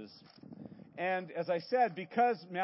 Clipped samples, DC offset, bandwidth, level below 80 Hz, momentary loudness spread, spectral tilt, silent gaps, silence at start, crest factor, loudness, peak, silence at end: under 0.1%; under 0.1%; 5.8 kHz; -82 dBFS; 20 LU; -9 dB/octave; none; 0 s; 18 dB; -33 LUFS; -18 dBFS; 0 s